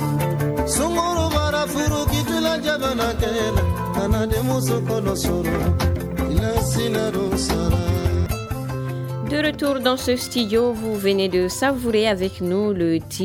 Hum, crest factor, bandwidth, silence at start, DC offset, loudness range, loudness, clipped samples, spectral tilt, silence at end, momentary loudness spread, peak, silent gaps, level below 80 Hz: none; 16 dB; 18 kHz; 0 s; under 0.1%; 2 LU; -21 LUFS; under 0.1%; -5 dB/octave; 0 s; 3 LU; -6 dBFS; none; -32 dBFS